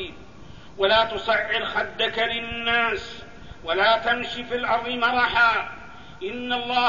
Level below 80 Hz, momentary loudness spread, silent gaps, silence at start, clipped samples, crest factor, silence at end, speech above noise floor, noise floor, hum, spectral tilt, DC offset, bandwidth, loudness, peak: -50 dBFS; 17 LU; none; 0 s; under 0.1%; 16 dB; 0 s; 22 dB; -45 dBFS; none; -4 dB/octave; 0.6%; 7.4 kHz; -22 LUFS; -8 dBFS